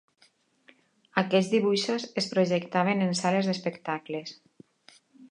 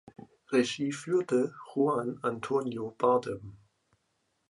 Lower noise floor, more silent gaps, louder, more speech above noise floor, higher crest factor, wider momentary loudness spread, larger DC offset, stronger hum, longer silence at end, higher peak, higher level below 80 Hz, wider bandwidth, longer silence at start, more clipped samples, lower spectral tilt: second, -65 dBFS vs -77 dBFS; neither; first, -27 LUFS vs -30 LUFS; second, 38 dB vs 47 dB; first, 24 dB vs 18 dB; about the same, 9 LU vs 9 LU; neither; neither; second, 0.05 s vs 0.95 s; first, -6 dBFS vs -12 dBFS; second, -78 dBFS vs -70 dBFS; about the same, 10.5 kHz vs 11.5 kHz; first, 1.15 s vs 0.2 s; neither; about the same, -5 dB/octave vs -5.5 dB/octave